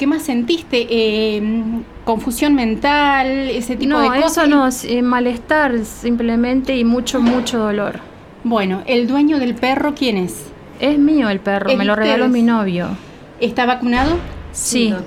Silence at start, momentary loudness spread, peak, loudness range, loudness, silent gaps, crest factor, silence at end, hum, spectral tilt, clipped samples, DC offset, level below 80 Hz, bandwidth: 0 s; 8 LU; -2 dBFS; 2 LU; -16 LUFS; none; 14 dB; 0 s; none; -4.5 dB/octave; under 0.1%; under 0.1%; -38 dBFS; 16 kHz